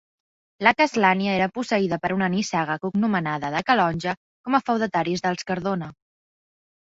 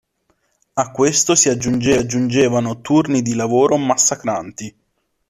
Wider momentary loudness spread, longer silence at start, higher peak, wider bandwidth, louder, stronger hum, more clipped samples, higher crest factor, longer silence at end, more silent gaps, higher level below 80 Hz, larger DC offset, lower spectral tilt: second, 9 LU vs 12 LU; second, 0.6 s vs 0.75 s; about the same, -2 dBFS vs 0 dBFS; second, 8 kHz vs 14 kHz; second, -23 LUFS vs -16 LUFS; neither; neither; first, 22 dB vs 16 dB; first, 0.95 s vs 0.6 s; first, 4.17-4.44 s vs none; second, -60 dBFS vs -50 dBFS; neither; first, -5.5 dB/octave vs -4 dB/octave